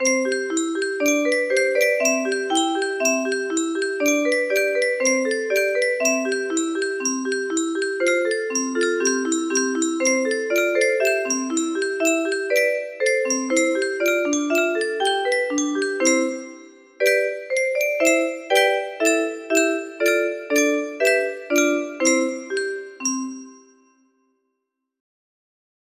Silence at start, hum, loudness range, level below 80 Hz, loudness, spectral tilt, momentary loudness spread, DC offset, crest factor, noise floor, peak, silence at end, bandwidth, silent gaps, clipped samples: 0 s; none; 2 LU; -72 dBFS; -21 LUFS; -0.5 dB/octave; 5 LU; under 0.1%; 18 dB; -79 dBFS; -4 dBFS; 2.45 s; 15 kHz; none; under 0.1%